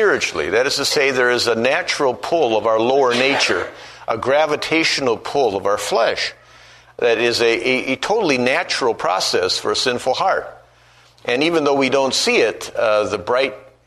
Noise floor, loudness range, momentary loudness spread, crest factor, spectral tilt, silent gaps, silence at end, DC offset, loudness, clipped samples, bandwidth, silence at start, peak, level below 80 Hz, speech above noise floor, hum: -50 dBFS; 2 LU; 6 LU; 16 dB; -3 dB/octave; none; 0.25 s; under 0.1%; -17 LUFS; under 0.1%; 13.5 kHz; 0 s; -2 dBFS; -56 dBFS; 33 dB; none